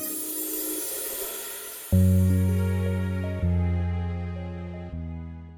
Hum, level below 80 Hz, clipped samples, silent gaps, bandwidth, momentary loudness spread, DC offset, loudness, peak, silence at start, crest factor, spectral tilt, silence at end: none; -40 dBFS; under 0.1%; none; over 20 kHz; 14 LU; under 0.1%; -27 LUFS; -10 dBFS; 0 s; 16 dB; -6 dB/octave; 0 s